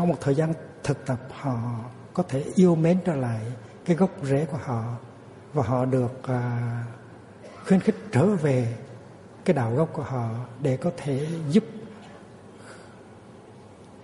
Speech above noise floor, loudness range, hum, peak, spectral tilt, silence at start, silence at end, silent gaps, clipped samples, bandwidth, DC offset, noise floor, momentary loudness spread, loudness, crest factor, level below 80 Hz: 23 dB; 4 LU; none; -6 dBFS; -8 dB/octave; 0 s; 0 s; none; under 0.1%; 11.5 kHz; under 0.1%; -47 dBFS; 23 LU; -26 LUFS; 20 dB; -60 dBFS